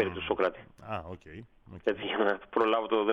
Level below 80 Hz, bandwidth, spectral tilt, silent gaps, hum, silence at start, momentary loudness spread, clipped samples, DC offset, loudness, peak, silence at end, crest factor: -60 dBFS; 6.6 kHz; -7 dB/octave; none; none; 0 s; 21 LU; under 0.1%; under 0.1%; -30 LUFS; -12 dBFS; 0 s; 18 dB